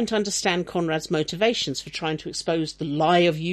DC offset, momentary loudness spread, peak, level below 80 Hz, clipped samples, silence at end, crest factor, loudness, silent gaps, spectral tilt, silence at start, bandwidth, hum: under 0.1%; 9 LU; -8 dBFS; -56 dBFS; under 0.1%; 0 s; 16 dB; -24 LUFS; none; -4 dB/octave; 0 s; 14 kHz; none